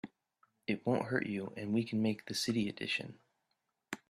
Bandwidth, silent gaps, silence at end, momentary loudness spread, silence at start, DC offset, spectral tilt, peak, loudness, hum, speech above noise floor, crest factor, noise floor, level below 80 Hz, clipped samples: 14.5 kHz; none; 0.15 s; 12 LU; 0.05 s; under 0.1%; -5 dB/octave; -18 dBFS; -36 LUFS; none; 48 dB; 20 dB; -84 dBFS; -74 dBFS; under 0.1%